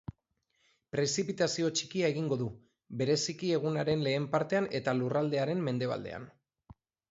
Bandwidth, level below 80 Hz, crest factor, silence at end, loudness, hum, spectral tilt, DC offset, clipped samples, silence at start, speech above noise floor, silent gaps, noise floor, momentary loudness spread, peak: 8 kHz; -66 dBFS; 18 dB; 0.4 s; -32 LUFS; none; -5 dB/octave; under 0.1%; under 0.1%; 0.95 s; 47 dB; none; -78 dBFS; 8 LU; -14 dBFS